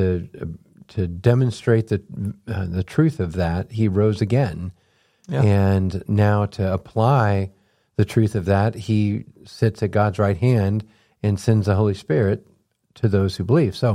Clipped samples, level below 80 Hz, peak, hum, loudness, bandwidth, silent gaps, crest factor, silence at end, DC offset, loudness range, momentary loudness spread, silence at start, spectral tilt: under 0.1%; -46 dBFS; -4 dBFS; none; -21 LUFS; 11.5 kHz; none; 16 dB; 0 s; under 0.1%; 2 LU; 11 LU; 0 s; -8 dB/octave